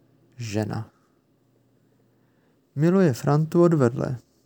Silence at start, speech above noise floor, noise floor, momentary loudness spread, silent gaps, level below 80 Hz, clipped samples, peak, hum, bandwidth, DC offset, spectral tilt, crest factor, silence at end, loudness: 0.4 s; 43 dB; -64 dBFS; 17 LU; none; -66 dBFS; under 0.1%; -6 dBFS; none; 19 kHz; under 0.1%; -8 dB/octave; 18 dB; 0.3 s; -22 LUFS